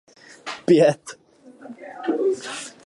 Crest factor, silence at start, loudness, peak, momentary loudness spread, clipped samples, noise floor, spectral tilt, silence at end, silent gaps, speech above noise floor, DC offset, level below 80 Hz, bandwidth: 18 dB; 0.45 s; -21 LUFS; -4 dBFS; 24 LU; under 0.1%; -43 dBFS; -5.5 dB/octave; 0.15 s; none; 23 dB; under 0.1%; -70 dBFS; 11.5 kHz